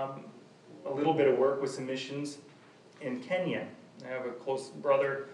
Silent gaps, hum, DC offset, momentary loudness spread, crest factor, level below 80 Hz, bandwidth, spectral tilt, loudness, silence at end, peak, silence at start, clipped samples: none; none; under 0.1%; 19 LU; 18 dB; -90 dBFS; 11 kHz; -5.5 dB/octave; -32 LUFS; 0 s; -14 dBFS; 0 s; under 0.1%